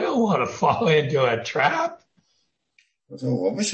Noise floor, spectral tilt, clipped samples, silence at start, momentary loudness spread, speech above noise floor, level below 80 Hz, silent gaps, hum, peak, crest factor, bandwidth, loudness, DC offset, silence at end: -71 dBFS; -5 dB/octave; under 0.1%; 0 s; 8 LU; 49 dB; -64 dBFS; none; none; -6 dBFS; 18 dB; 8.8 kHz; -22 LUFS; under 0.1%; 0 s